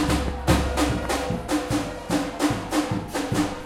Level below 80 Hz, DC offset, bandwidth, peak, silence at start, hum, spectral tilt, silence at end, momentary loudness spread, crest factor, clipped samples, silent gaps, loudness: -34 dBFS; under 0.1%; 16.5 kHz; -4 dBFS; 0 s; none; -5 dB/octave; 0 s; 5 LU; 20 dB; under 0.1%; none; -25 LUFS